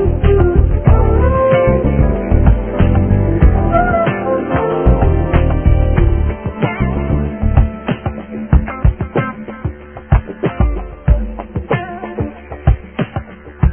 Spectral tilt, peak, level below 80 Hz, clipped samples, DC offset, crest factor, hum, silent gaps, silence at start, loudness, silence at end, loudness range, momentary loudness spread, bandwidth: -12.5 dB/octave; 0 dBFS; -16 dBFS; under 0.1%; 0.3%; 14 dB; none; none; 0 s; -15 LUFS; 0 s; 6 LU; 12 LU; 3.4 kHz